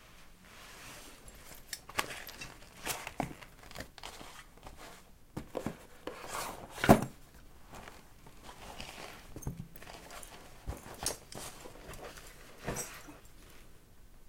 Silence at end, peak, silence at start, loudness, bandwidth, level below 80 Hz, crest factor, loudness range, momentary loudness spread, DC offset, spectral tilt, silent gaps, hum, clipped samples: 0 s; -6 dBFS; 0 s; -38 LUFS; 16.5 kHz; -54 dBFS; 34 dB; 12 LU; 17 LU; under 0.1%; -4.5 dB/octave; none; none; under 0.1%